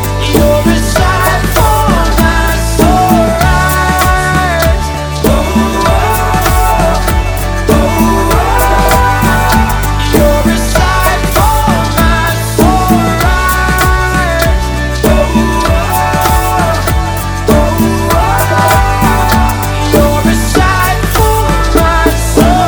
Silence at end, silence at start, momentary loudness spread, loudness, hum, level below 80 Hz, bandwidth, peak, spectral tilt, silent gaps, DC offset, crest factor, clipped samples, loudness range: 0 s; 0 s; 3 LU; -10 LUFS; none; -14 dBFS; over 20 kHz; 0 dBFS; -5 dB/octave; none; under 0.1%; 8 dB; 0.9%; 1 LU